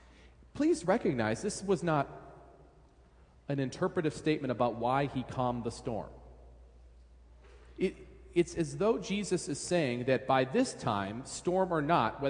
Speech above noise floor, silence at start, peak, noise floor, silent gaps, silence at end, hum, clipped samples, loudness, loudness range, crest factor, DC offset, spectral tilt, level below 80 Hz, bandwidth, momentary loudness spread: 29 dB; 0.25 s; -14 dBFS; -60 dBFS; none; 0 s; none; under 0.1%; -32 LUFS; 6 LU; 20 dB; under 0.1%; -5.5 dB/octave; -58 dBFS; 10.5 kHz; 10 LU